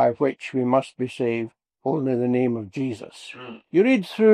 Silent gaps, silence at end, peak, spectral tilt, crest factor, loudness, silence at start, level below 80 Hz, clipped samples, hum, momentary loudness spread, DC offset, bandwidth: none; 0 s; -6 dBFS; -7.5 dB/octave; 16 dB; -23 LUFS; 0 s; -70 dBFS; under 0.1%; none; 17 LU; under 0.1%; 11 kHz